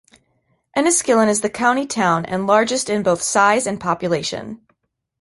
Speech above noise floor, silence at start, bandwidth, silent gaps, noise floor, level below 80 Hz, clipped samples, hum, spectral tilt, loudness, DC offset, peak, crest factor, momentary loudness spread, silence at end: 51 dB; 0.75 s; 11.5 kHz; none; -69 dBFS; -56 dBFS; under 0.1%; none; -3.5 dB/octave; -18 LUFS; under 0.1%; -2 dBFS; 18 dB; 7 LU; 0.65 s